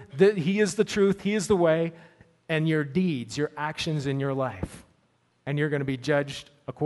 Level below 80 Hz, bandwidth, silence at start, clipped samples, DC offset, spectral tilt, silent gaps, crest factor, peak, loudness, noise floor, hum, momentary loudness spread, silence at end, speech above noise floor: -56 dBFS; 11.5 kHz; 0 s; under 0.1%; under 0.1%; -6 dB/octave; none; 18 dB; -8 dBFS; -26 LUFS; -68 dBFS; none; 11 LU; 0 s; 42 dB